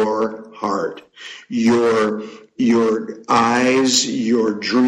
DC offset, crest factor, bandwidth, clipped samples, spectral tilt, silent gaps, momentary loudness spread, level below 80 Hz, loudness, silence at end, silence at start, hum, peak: under 0.1%; 14 dB; 12.5 kHz; under 0.1%; -3.5 dB/octave; none; 14 LU; -60 dBFS; -18 LUFS; 0 s; 0 s; none; -4 dBFS